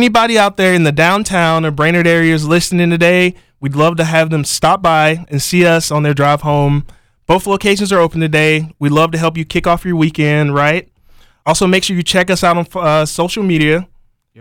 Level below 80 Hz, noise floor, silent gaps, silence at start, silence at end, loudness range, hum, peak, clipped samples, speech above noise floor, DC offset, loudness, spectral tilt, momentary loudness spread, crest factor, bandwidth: -38 dBFS; -45 dBFS; none; 0 s; 0.55 s; 2 LU; none; -2 dBFS; under 0.1%; 33 dB; 0.2%; -12 LUFS; -5 dB/octave; 5 LU; 10 dB; 17 kHz